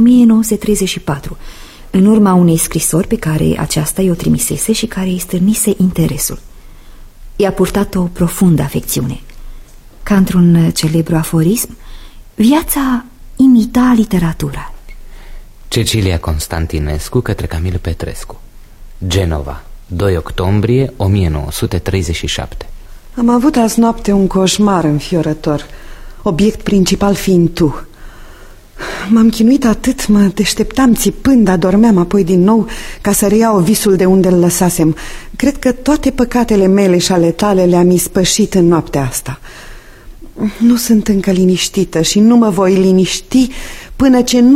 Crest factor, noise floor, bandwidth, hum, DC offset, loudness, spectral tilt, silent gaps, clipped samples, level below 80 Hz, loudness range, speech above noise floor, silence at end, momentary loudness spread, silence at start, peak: 12 dB; -35 dBFS; 16.5 kHz; none; under 0.1%; -12 LUFS; -5.5 dB/octave; none; under 0.1%; -28 dBFS; 6 LU; 23 dB; 0 s; 12 LU; 0 s; 0 dBFS